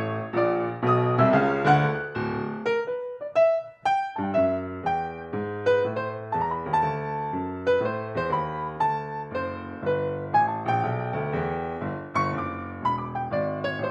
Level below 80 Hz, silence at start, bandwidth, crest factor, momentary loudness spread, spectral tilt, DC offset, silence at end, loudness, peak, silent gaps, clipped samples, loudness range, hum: -56 dBFS; 0 s; 9 kHz; 20 dB; 10 LU; -8 dB/octave; under 0.1%; 0 s; -26 LUFS; -6 dBFS; none; under 0.1%; 4 LU; none